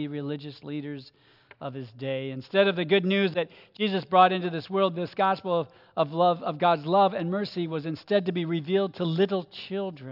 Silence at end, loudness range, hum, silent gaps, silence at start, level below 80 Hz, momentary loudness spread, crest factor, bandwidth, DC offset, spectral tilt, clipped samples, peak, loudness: 0 s; 3 LU; none; none; 0 s; -78 dBFS; 14 LU; 20 dB; 5.8 kHz; under 0.1%; -8.5 dB/octave; under 0.1%; -6 dBFS; -26 LUFS